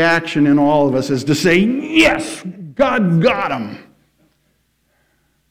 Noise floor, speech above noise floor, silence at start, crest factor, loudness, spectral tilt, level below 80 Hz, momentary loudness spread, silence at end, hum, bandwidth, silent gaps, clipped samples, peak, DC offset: -63 dBFS; 48 dB; 0 s; 14 dB; -15 LUFS; -5.5 dB/octave; -46 dBFS; 13 LU; 1.7 s; none; 16 kHz; none; under 0.1%; -2 dBFS; under 0.1%